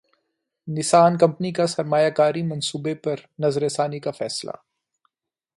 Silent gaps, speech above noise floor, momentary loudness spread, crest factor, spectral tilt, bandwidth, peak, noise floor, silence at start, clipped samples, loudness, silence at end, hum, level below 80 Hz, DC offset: none; 64 dB; 14 LU; 20 dB; -5 dB/octave; 11.5 kHz; -4 dBFS; -86 dBFS; 0.65 s; under 0.1%; -22 LUFS; 1.05 s; none; -68 dBFS; under 0.1%